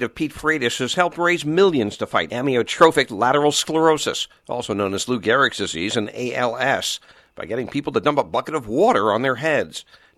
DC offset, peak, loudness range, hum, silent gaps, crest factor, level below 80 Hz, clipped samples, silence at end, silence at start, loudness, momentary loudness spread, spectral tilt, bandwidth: under 0.1%; 0 dBFS; 4 LU; none; none; 20 dB; -56 dBFS; under 0.1%; 0.35 s; 0 s; -20 LUFS; 9 LU; -4 dB/octave; 14.5 kHz